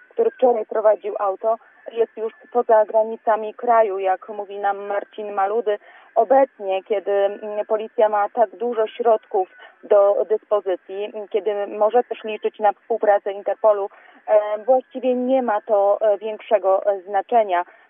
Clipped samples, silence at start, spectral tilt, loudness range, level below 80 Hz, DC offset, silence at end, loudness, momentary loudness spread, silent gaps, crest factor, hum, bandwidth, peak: under 0.1%; 0.15 s; -8.5 dB/octave; 2 LU; under -90 dBFS; under 0.1%; 0.25 s; -20 LUFS; 9 LU; none; 16 dB; none; 3.6 kHz; -4 dBFS